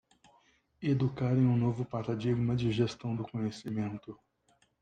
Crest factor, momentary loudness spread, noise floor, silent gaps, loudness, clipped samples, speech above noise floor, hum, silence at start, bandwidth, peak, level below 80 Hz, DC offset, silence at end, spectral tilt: 16 dB; 10 LU; -71 dBFS; none; -32 LUFS; under 0.1%; 40 dB; none; 0.8 s; 9 kHz; -16 dBFS; -62 dBFS; under 0.1%; 0.65 s; -8 dB/octave